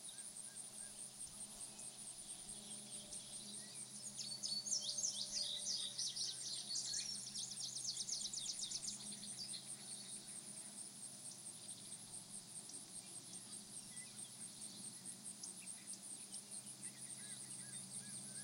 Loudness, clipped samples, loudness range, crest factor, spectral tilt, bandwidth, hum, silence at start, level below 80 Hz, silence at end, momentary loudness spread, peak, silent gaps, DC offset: -46 LUFS; under 0.1%; 9 LU; 22 dB; 0 dB/octave; 16.5 kHz; none; 0 s; -82 dBFS; 0 s; 10 LU; -28 dBFS; none; under 0.1%